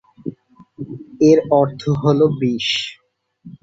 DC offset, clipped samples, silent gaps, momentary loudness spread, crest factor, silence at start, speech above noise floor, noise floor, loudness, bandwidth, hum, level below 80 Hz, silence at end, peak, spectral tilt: under 0.1%; under 0.1%; none; 19 LU; 16 dB; 0.25 s; 31 dB; -46 dBFS; -16 LUFS; 8 kHz; none; -54 dBFS; 0.1 s; -2 dBFS; -6.5 dB/octave